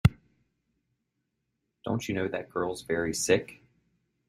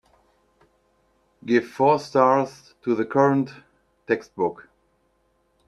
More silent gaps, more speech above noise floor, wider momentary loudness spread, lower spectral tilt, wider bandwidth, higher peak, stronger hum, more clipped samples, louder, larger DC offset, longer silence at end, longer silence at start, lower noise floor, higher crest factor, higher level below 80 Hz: neither; first, 51 dB vs 46 dB; second, 8 LU vs 13 LU; second, -5 dB/octave vs -7 dB/octave; first, 16 kHz vs 12 kHz; about the same, -6 dBFS vs -4 dBFS; neither; neither; second, -30 LUFS vs -22 LUFS; neither; second, 0.75 s vs 1.15 s; second, 0.05 s vs 1.45 s; first, -81 dBFS vs -67 dBFS; about the same, 26 dB vs 22 dB; first, -50 dBFS vs -68 dBFS